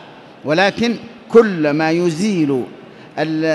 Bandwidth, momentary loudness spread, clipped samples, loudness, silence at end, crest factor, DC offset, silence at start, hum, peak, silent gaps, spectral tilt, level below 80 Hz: 12 kHz; 15 LU; under 0.1%; -16 LUFS; 0 s; 16 dB; under 0.1%; 0 s; none; -2 dBFS; none; -6 dB/octave; -58 dBFS